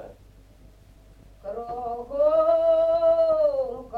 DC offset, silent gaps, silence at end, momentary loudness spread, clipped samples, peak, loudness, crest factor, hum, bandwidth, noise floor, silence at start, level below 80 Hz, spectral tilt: under 0.1%; none; 0 s; 15 LU; under 0.1%; -12 dBFS; -22 LUFS; 12 dB; none; 4.7 kHz; -51 dBFS; 0 s; -52 dBFS; -7 dB/octave